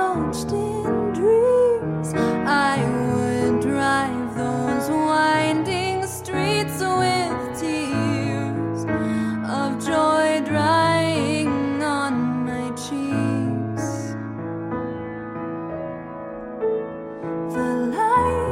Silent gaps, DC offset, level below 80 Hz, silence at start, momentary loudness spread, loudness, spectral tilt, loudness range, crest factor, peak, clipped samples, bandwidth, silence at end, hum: none; under 0.1%; -48 dBFS; 0 s; 12 LU; -22 LUFS; -5.5 dB/octave; 8 LU; 14 dB; -8 dBFS; under 0.1%; 16 kHz; 0 s; none